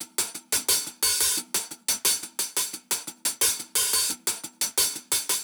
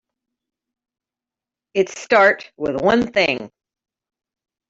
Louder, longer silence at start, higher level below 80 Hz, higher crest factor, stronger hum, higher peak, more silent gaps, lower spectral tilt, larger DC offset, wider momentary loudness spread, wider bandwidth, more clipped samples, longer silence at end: second, -24 LUFS vs -18 LUFS; second, 0 s vs 1.75 s; about the same, -60 dBFS vs -58 dBFS; about the same, 18 dB vs 20 dB; neither; second, -8 dBFS vs -2 dBFS; neither; second, 1.5 dB/octave vs -4.5 dB/octave; neither; second, 7 LU vs 11 LU; first, over 20 kHz vs 7.8 kHz; neither; second, 0 s vs 1.25 s